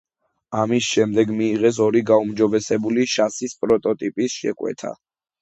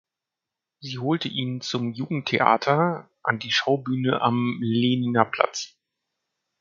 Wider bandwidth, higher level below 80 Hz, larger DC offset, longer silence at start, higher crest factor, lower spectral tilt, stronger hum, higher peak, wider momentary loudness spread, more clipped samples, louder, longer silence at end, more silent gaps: first, 8.2 kHz vs 7.4 kHz; first, -60 dBFS vs -66 dBFS; neither; second, 0.5 s vs 0.8 s; second, 18 dB vs 24 dB; about the same, -5 dB/octave vs -5.5 dB/octave; neither; about the same, -2 dBFS vs 0 dBFS; about the same, 9 LU vs 8 LU; neither; first, -20 LUFS vs -24 LUFS; second, 0.5 s vs 0.95 s; neither